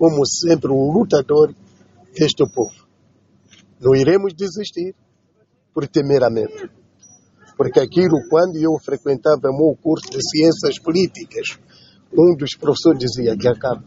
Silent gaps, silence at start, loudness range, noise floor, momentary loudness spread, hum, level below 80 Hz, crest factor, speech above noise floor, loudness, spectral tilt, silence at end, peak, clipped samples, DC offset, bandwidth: none; 0 s; 4 LU; -61 dBFS; 12 LU; none; -54 dBFS; 18 dB; 44 dB; -17 LUFS; -5.5 dB/octave; 0.05 s; 0 dBFS; under 0.1%; under 0.1%; 8 kHz